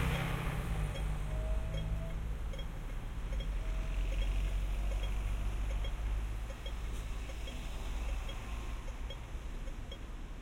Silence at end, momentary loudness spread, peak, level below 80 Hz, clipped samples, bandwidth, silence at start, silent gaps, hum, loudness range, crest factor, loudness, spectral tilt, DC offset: 0 s; 8 LU; -22 dBFS; -38 dBFS; under 0.1%; 15.5 kHz; 0 s; none; none; 4 LU; 14 dB; -41 LUFS; -5.5 dB/octave; under 0.1%